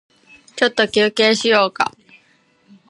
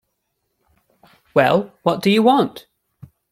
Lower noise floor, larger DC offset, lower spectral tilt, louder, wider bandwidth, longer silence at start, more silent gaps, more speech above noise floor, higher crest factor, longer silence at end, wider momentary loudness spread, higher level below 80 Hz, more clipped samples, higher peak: second, -57 dBFS vs -73 dBFS; neither; second, -3 dB/octave vs -6 dB/octave; about the same, -16 LUFS vs -17 LUFS; second, 11.5 kHz vs 15.5 kHz; second, 0.55 s vs 1.35 s; neither; second, 42 dB vs 57 dB; about the same, 18 dB vs 18 dB; first, 1 s vs 0.75 s; about the same, 8 LU vs 7 LU; about the same, -64 dBFS vs -62 dBFS; neither; about the same, 0 dBFS vs -2 dBFS